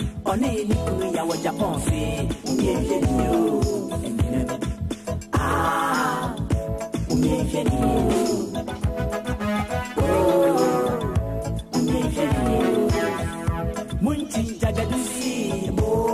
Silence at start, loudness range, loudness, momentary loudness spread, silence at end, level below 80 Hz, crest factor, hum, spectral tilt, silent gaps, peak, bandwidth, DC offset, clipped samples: 0 s; 2 LU; -23 LUFS; 7 LU; 0 s; -34 dBFS; 14 dB; none; -6 dB/octave; none; -8 dBFS; 15 kHz; under 0.1%; under 0.1%